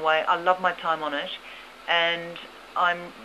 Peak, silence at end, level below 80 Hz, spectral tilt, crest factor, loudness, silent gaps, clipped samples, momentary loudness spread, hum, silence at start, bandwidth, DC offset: -6 dBFS; 0 s; -68 dBFS; -3.5 dB/octave; 20 dB; -25 LUFS; none; under 0.1%; 16 LU; none; 0 s; 13.5 kHz; under 0.1%